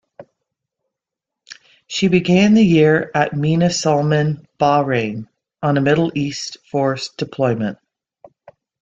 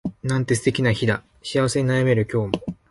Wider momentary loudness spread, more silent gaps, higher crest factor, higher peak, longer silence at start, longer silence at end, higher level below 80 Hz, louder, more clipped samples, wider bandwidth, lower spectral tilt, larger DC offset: first, 12 LU vs 7 LU; neither; about the same, 16 dB vs 20 dB; about the same, -2 dBFS vs -2 dBFS; first, 0.2 s vs 0.05 s; first, 1.1 s vs 0.2 s; second, -54 dBFS vs -48 dBFS; first, -17 LUFS vs -22 LUFS; neither; second, 7.8 kHz vs 11.5 kHz; about the same, -6 dB/octave vs -6 dB/octave; neither